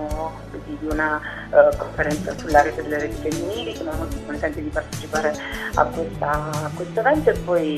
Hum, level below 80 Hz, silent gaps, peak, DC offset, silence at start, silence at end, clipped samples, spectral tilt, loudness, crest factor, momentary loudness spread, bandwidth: none; -36 dBFS; none; 0 dBFS; under 0.1%; 0 s; 0 s; under 0.1%; -5.5 dB/octave; -22 LUFS; 22 dB; 10 LU; 13.5 kHz